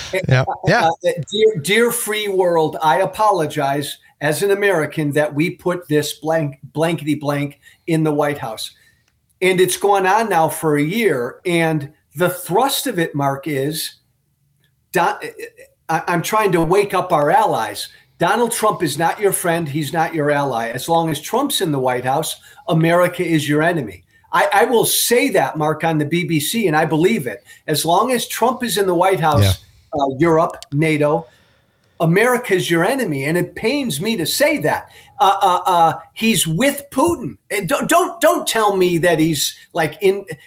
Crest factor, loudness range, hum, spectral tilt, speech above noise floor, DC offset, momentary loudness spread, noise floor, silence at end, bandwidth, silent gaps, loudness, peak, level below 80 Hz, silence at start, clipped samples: 14 dB; 4 LU; none; -4.5 dB/octave; 46 dB; under 0.1%; 8 LU; -63 dBFS; 0.1 s; 16.5 kHz; none; -17 LUFS; -4 dBFS; -52 dBFS; 0 s; under 0.1%